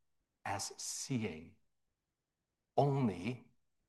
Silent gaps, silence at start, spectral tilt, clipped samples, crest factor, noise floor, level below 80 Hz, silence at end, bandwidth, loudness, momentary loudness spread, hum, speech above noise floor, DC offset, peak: none; 0.45 s; -5 dB/octave; under 0.1%; 22 dB; -90 dBFS; -78 dBFS; 0.45 s; 12.5 kHz; -38 LUFS; 14 LU; none; 52 dB; under 0.1%; -18 dBFS